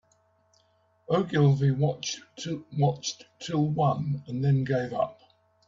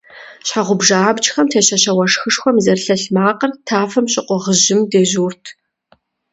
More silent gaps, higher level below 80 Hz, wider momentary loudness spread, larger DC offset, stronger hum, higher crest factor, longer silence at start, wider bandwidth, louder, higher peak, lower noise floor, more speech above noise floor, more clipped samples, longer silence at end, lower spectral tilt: neither; about the same, -64 dBFS vs -60 dBFS; first, 12 LU vs 7 LU; neither; neither; about the same, 18 dB vs 16 dB; first, 1.1 s vs 0.15 s; about the same, 7.6 kHz vs 8.2 kHz; second, -27 LUFS vs -14 LUFS; second, -10 dBFS vs 0 dBFS; first, -67 dBFS vs -56 dBFS; about the same, 41 dB vs 42 dB; neither; second, 0.55 s vs 0.8 s; first, -6.5 dB/octave vs -3 dB/octave